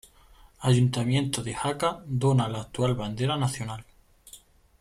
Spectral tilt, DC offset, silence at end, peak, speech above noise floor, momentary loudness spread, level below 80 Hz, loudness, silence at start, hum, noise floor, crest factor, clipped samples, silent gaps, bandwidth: -6 dB/octave; under 0.1%; 0.45 s; -12 dBFS; 29 dB; 8 LU; -54 dBFS; -27 LUFS; 0.6 s; none; -55 dBFS; 16 dB; under 0.1%; none; 13.5 kHz